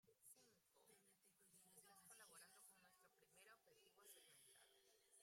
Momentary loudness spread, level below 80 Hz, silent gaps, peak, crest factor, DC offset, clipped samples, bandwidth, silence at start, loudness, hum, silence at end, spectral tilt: 4 LU; under -90 dBFS; none; -52 dBFS; 20 dB; under 0.1%; under 0.1%; 16 kHz; 0.05 s; -68 LUFS; none; 0 s; -1 dB/octave